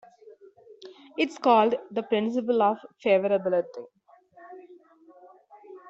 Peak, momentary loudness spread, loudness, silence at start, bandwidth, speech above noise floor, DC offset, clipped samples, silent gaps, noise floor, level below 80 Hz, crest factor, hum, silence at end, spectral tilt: -8 dBFS; 22 LU; -25 LUFS; 0.7 s; 8 kHz; 31 dB; under 0.1%; under 0.1%; none; -55 dBFS; -76 dBFS; 20 dB; none; 0 s; -6 dB/octave